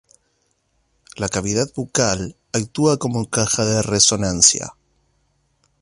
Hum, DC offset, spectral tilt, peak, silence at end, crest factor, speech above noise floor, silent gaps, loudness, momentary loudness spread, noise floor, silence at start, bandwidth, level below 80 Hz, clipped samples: none; under 0.1%; -3 dB/octave; 0 dBFS; 1.1 s; 22 dB; 48 dB; none; -18 LUFS; 12 LU; -67 dBFS; 1.15 s; 11.5 kHz; -46 dBFS; under 0.1%